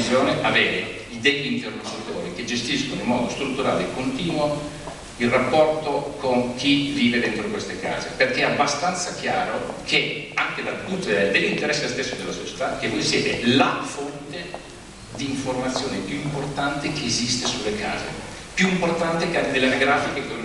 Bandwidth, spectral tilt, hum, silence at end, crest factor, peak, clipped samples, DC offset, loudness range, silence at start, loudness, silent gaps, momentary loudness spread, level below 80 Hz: 12 kHz; -4 dB/octave; none; 0 s; 20 dB; -4 dBFS; under 0.1%; under 0.1%; 3 LU; 0 s; -23 LUFS; none; 11 LU; -48 dBFS